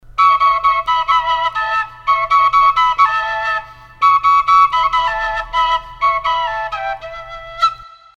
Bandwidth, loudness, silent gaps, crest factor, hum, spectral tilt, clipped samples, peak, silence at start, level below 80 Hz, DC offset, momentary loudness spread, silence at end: 8.4 kHz; -14 LUFS; none; 14 dB; none; -1 dB/octave; under 0.1%; 0 dBFS; 0.15 s; -42 dBFS; under 0.1%; 11 LU; 0.3 s